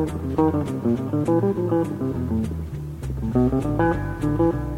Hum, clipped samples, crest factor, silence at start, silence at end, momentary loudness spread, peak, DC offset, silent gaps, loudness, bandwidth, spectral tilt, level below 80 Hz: none; under 0.1%; 16 dB; 0 s; 0 s; 8 LU; -6 dBFS; under 0.1%; none; -23 LUFS; 16 kHz; -9 dB/octave; -36 dBFS